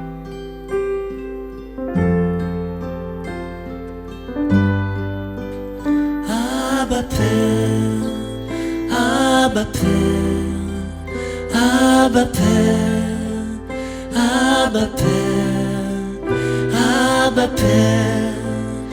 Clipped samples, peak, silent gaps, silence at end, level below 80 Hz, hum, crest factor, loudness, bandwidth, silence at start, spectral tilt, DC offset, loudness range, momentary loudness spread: under 0.1%; 0 dBFS; none; 0 s; -36 dBFS; none; 18 dB; -18 LUFS; 18.5 kHz; 0 s; -5.5 dB/octave; under 0.1%; 6 LU; 14 LU